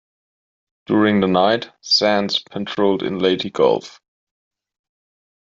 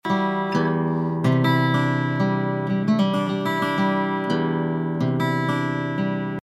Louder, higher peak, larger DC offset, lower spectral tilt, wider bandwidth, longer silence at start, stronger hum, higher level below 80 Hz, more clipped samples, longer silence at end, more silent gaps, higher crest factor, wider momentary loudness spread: first, -18 LUFS vs -22 LUFS; first, -2 dBFS vs -8 dBFS; neither; second, -5 dB/octave vs -7.5 dB/octave; second, 7.6 kHz vs 12.5 kHz; first, 0.9 s vs 0.05 s; neither; about the same, -62 dBFS vs -64 dBFS; neither; first, 1.65 s vs 0.05 s; neither; about the same, 18 dB vs 14 dB; first, 7 LU vs 4 LU